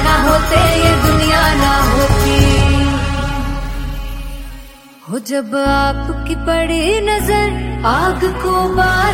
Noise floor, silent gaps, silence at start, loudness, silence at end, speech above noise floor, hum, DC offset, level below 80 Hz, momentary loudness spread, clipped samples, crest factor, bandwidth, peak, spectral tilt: -36 dBFS; none; 0 s; -14 LUFS; 0 s; 22 dB; none; under 0.1%; -20 dBFS; 13 LU; under 0.1%; 14 dB; 16.5 kHz; 0 dBFS; -5 dB/octave